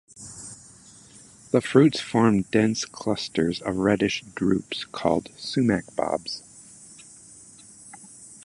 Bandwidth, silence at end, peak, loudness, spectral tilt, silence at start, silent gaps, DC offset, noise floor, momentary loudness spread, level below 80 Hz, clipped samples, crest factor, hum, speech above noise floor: 11.5 kHz; 0.1 s; -4 dBFS; -24 LUFS; -5.5 dB/octave; 0.15 s; none; under 0.1%; -50 dBFS; 24 LU; -56 dBFS; under 0.1%; 22 dB; none; 27 dB